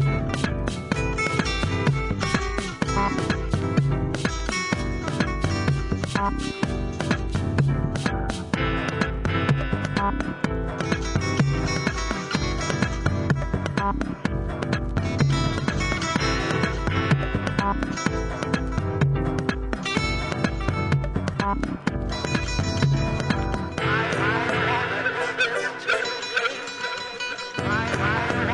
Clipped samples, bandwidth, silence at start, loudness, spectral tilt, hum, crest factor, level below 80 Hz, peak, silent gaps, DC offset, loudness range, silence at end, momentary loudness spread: under 0.1%; 11 kHz; 0 s; -25 LUFS; -5.5 dB/octave; none; 22 dB; -34 dBFS; -4 dBFS; none; under 0.1%; 2 LU; 0 s; 5 LU